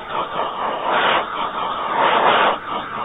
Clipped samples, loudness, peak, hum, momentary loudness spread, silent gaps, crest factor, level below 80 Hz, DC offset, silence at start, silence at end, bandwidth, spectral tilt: under 0.1%; -19 LUFS; -2 dBFS; none; 9 LU; none; 18 dB; -54 dBFS; under 0.1%; 0 s; 0 s; 4 kHz; -6 dB/octave